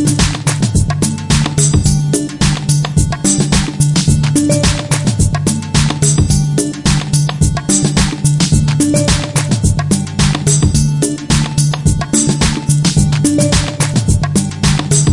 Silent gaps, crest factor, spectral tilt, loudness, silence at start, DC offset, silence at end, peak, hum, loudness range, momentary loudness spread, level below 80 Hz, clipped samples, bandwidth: none; 12 dB; -4.5 dB/octave; -13 LUFS; 0 s; under 0.1%; 0 s; 0 dBFS; none; 1 LU; 4 LU; -24 dBFS; under 0.1%; 11.5 kHz